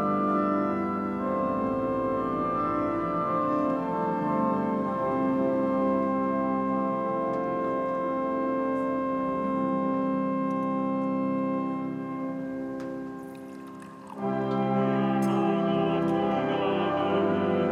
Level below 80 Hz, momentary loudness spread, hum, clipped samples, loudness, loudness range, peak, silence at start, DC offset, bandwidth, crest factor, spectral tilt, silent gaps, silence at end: -60 dBFS; 8 LU; none; under 0.1%; -27 LUFS; 4 LU; -14 dBFS; 0 s; under 0.1%; 11 kHz; 14 dB; -8.5 dB/octave; none; 0 s